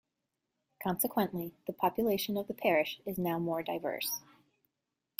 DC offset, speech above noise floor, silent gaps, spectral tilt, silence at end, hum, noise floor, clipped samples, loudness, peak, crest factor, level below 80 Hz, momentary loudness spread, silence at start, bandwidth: under 0.1%; 54 dB; none; -4.5 dB/octave; 1 s; none; -87 dBFS; under 0.1%; -34 LUFS; -14 dBFS; 20 dB; -70 dBFS; 8 LU; 0.8 s; 16 kHz